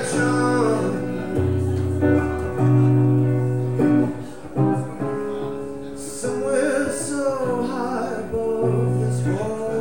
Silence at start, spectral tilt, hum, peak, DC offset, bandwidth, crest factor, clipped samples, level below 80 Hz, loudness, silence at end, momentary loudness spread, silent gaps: 0 s; -7 dB/octave; none; -6 dBFS; 1%; 16.5 kHz; 14 dB; under 0.1%; -46 dBFS; -22 LUFS; 0 s; 9 LU; none